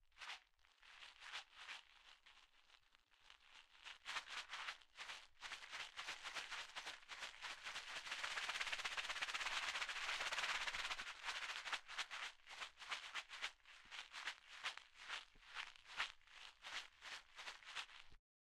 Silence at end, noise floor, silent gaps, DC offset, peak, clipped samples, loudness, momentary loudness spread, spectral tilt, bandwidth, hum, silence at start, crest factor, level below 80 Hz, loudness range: 0.3 s; -74 dBFS; none; under 0.1%; -26 dBFS; under 0.1%; -48 LUFS; 16 LU; 1.5 dB/octave; 15 kHz; none; 0.05 s; 26 dB; -76 dBFS; 11 LU